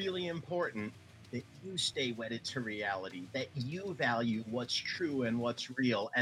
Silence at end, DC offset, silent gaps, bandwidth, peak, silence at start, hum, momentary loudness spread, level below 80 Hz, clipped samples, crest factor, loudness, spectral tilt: 0 s; under 0.1%; none; 13.5 kHz; -18 dBFS; 0 s; none; 10 LU; -78 dBFS; under 0.1%; 18 dB; -36 LUFS; -4.5 dB/octave